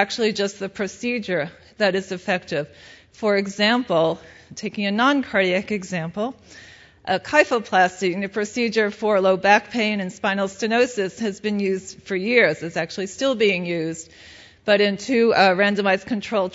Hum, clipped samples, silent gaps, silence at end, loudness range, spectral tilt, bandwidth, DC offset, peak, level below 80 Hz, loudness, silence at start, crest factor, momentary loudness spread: none; under 0.1%; none; 0 s; 3 LU; -4.5 dB/octave; 8 kHz; under 0.1%; 0 dBFS; -62 dBFS; -21 LUFS; 0 s; 20 dB; 11 LU